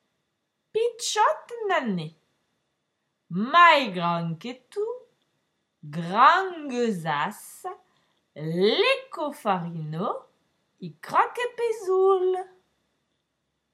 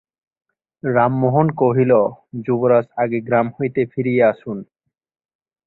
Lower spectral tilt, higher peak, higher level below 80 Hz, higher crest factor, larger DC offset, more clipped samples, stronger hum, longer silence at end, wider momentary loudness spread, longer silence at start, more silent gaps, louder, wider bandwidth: second, -4.5 dB/octave vs -12 dB/octave; about the same, -4 dBFS vs -2 dBFS; second, -84 dBFS vs -60 dBFS; about the same, 22 dB vs 18 dB; neither; neither; neither; first, 1.25 s vs 1.05 s; first, 20 LU vs 12 LU; about the same, 0.75 s vs 0.85 s; neither; second, -24 LUFS vs -18 LUFS; first, 15 kHz vs 4.1 kHz